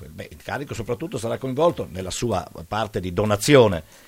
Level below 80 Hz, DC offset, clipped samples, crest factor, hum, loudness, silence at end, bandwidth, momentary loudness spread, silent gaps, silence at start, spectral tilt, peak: -48 dBFS; under 0.1%; under 0.1%; 22 dB; none; -22 LUFS; 0.25 s; 16.5 kHz; 15 LU; none; 0 s; -5 dB/octave; 0 dBFS